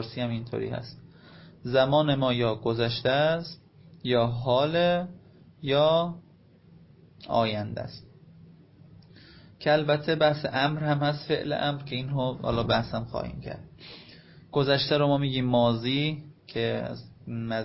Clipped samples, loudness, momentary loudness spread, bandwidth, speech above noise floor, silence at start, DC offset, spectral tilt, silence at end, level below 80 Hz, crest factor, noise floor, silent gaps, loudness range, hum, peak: under 0.1%; -27 LUFS; 17 LU; 5.8 kHz; 29 dB; 0 s; under 0.1%; -10 dB/octave; 0 s; -54 dBFS; 18 dB; -56 dBFS; none; 4 LU; none; -10 dBFS